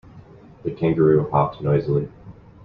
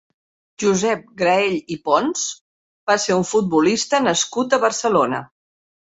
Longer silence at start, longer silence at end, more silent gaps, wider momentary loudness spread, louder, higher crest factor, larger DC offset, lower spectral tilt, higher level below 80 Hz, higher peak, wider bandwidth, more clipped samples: second, 0.15 s vs 0.6 s; second, 0.35 s vs 0.6 s; second, none vs 2.41-2.87 s; first, 15 LU vs 7 LU; about the same, -20 LUFS vs -19 LUFS; about the same, 18 dB vs 18 dB; neither; first, -11.5 dB/octave vs -3.5 dB/octave; first, -50 dBFS vs -60 dBFS; about the same, -4 dBFS vs -2 dBFS; second, 4.9 kHz vs 8.4 kHz; neither